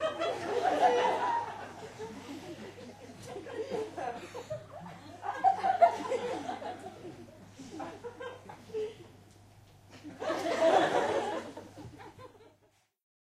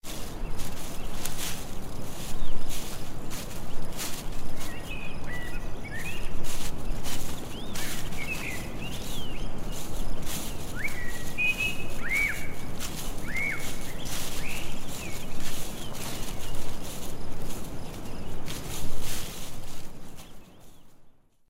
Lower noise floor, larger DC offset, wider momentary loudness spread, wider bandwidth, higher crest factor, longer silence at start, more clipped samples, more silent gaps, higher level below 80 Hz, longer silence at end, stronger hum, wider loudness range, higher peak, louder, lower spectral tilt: first, -69 dBFS vs -51 dBFS; neither; first, 23 LU vs 10 LU; second, 14.5 kHz vs 16 kHz; first, 22 dB vs 14 dB; about the same, 0 s vs 0.05 s; neither; neither; second, -70 dBFS vs -34 dBFS; first, 0.8 s vs 0.4 s; neither; about the same, 10 LU vs 8 LU; second, -12 dBFS vs -8 dBFS; first, -32 LUFS vs -35 LUFS; about the same, -4.5 dB/octave vs -3.5 dB/octave